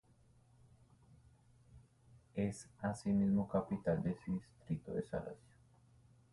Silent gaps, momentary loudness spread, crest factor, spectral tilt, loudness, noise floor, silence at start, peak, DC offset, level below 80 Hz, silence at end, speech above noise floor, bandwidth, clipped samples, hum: none; 11 LU; 20 dB; -8 dB/octave; -39 LUFS; -69 dBFS; 1.75 s; -22 dBFS; under 0.1%; -64 dBFS; 0.95 s; 30 dB; 11.5 kHz; under 0.1%; none